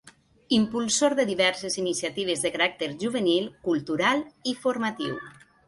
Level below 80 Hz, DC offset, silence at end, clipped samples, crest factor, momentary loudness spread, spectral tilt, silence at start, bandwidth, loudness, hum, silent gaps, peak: -66 dBFS; under 0.1%; 0.35 s; under 0.1%; 18 dB; 8 LU; -3 dB/octave; 0.05 s; 11.5 kHz; -26 LUFS; none; none; -10 dBFS